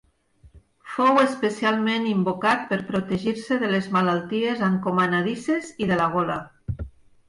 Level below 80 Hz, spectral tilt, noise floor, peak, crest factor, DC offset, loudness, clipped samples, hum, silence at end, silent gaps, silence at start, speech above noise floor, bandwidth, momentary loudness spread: -50 dBFS; -6 dB/octave; -56 dBFS; -10 dBFS; 14 dB; under 0.1%; -23 LUFS; under 0.1%; none; 0.4 s; none; 0.45 s; 33 dB; 11 kHz; 11 LU